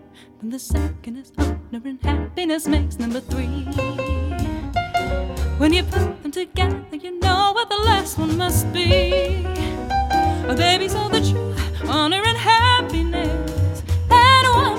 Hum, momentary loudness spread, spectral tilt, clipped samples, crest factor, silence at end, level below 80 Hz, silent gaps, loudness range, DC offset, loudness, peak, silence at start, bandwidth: none; 11 LU; -5 dB/octave; under 0.1%; 18 dB; 0 s; -28 dBFS; none; 6 LU; under 0.1%; -19 LUFS; 0 dBFS; 0.2 s; 17 kHz